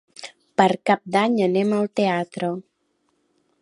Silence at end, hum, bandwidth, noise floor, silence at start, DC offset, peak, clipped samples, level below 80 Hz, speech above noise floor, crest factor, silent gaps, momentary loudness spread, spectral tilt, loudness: 1 s; none; 11 kHz; -70 dBFS; 0.2 s; under 0.1%; -2 dBFS; under 0.1%; -72 dBFS; 49 dB; 22 dB; none; 12 LU; -6 dB/octave; -21 LUFS